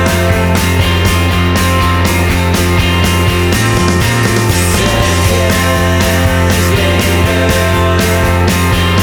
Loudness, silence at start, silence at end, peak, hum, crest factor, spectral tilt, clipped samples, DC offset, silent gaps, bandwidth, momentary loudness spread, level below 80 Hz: -11 LUFS; 0 s; 0 s; 0 dBFS; none; 10 dB; -4.5 dB/octave; under 0.1%; under 0.1%; none; over 20 kHz; 1 LU; -22 dBFS